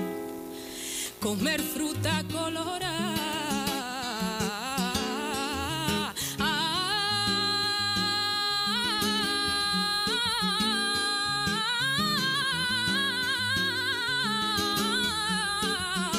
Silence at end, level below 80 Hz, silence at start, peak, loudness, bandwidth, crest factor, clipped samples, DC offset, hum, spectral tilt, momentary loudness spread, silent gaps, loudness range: 0 s; -54 dBFS; 0 s; -14 dBFS; -27 LUFS; 16 kHz; 14 dB; under 0.1%; under 0.1%; none; -2.5 dB/octave; 6 LU; none; 4 LU